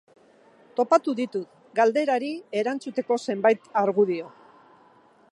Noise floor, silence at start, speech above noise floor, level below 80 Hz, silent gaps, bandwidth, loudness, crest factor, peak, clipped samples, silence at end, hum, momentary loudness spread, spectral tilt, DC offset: -57 dBFS; 0.75 s; 33 dB; -82 dBFS; none; 11 kHz; -25 LUFS; 20 dB; -6 dBFS; under 0.1%; 1.05 s; none; 10 LU; -5.5 dB/octave; under 0.1%